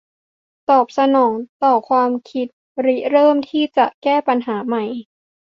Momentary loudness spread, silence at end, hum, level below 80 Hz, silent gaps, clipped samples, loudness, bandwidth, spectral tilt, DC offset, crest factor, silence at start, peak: 12 LU; 0.55 s; none; -68 dBFS; 1.49-1.60 s, 2.53-2.75 s, 3.94-4.02 s; under 0.1%; -17 LUFS; 7.2 kHz; -6 dB/octave; under 0.1%; 16 dB; 0.7 s; -2 dBFS